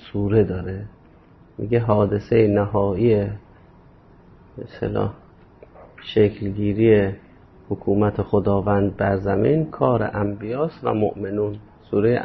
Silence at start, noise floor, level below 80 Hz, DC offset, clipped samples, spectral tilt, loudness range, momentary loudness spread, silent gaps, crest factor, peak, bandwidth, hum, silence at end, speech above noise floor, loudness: 0 s; -50 dBFS; -44 dBFS; under 0.1%; under 0.1%; -10.5 dB/octave; 5 LU; 14 LU; none; 18 dB; -4 dBFS; 5.8 kHz; none; 0 s; 30 dB; -21 LUFS